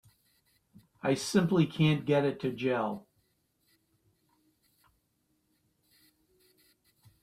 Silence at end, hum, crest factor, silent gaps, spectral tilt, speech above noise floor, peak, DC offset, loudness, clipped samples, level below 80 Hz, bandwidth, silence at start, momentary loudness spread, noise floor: 4.25 s; none; 20 dB; none; -6 dB/octave; 48 dB; -14 dBFS; under 0.1%; -29 LUFS; under 0.1%; -70 dBFS; 14.5 kHz; 1.05 s; 9 LU; -76 dBFS